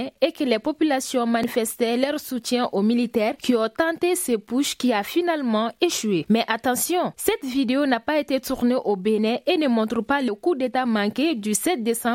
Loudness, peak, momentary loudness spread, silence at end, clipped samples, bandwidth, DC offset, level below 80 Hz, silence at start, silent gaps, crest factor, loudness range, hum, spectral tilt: -22 LUFS; -4 dBFS; 2 LU; 0 s; under 0.1%; 16.5 kHz; under 0.1%; -60 dBFS; 0 s; none; 18 dB; 0 LU; none; -4 dB/octave